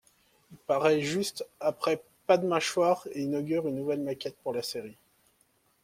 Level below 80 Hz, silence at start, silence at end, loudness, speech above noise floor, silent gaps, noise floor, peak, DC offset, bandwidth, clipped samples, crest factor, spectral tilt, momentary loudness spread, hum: -72 dBFS; 0.5 s; 0.9 s; -29 LUFS; 40 dB; none; -69 dBFS; -10 dBFS; under 0.1%; 16.5 kHz; under 0.1%; 22 dB; -4.5 dB/octave; 10 LU; none